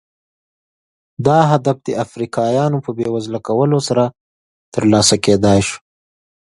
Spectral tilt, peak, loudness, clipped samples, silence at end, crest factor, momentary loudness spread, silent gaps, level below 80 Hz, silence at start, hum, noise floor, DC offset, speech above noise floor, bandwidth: -5 dB/octave; 0 dBFS; -16 LUFS; under 0.1%; 0.7 s; 16 dB; 10 LU; 4.20-4.72 s; -44 dBFS; 1.2 s; none; under -90 dBFS; under 0.1%; over 75 dB; 11.5 kHz